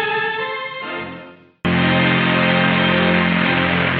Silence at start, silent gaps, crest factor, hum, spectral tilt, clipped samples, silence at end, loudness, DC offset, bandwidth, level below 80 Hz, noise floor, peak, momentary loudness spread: 0 s; none; 16 dB; none; -3.5 dB/octave; under 0.1%; 0 s; -17 LUFS; under 0.1%; 4.9 kHz; -48 dBFS; -39 dBFS; -2 dBFS; 12 LU